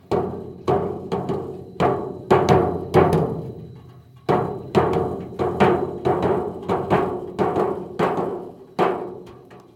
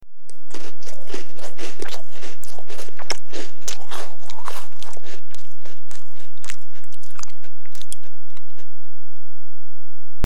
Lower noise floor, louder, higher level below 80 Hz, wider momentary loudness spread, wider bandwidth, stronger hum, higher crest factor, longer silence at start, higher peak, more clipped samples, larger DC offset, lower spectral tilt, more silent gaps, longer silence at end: second, -45 dBFS vs -60 dBFS; first, -22 LUFS vs -37 LUFS; first, -50 dBFS vs -64 dBFS; second, 14 LU vs 20 LU; second, 13.5 kHz vs 18 kHz; neither; about the same, 22 dB vs 18 dB; about the same, 0.1 s vs 0 s; about the same, 0 dBFS vs -2 dBFS; neither; second, under 0.1% vs 50%; first, -7.5 dB/octave vs -4 dB/octave; neither; first, 0.15 s vs 0 s